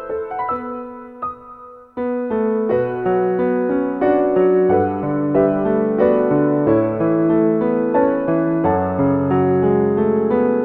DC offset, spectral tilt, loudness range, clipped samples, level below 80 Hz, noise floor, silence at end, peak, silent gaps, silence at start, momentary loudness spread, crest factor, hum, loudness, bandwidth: under 0.1%; -11.5 dB/octave; 5 LU; under 0.1%; -48 dBFS; -39 dBFS; 0 s; -2 dBFS; none; 0 s; 11 LU; 14 dB; none; -17 LUFS; 4 kHz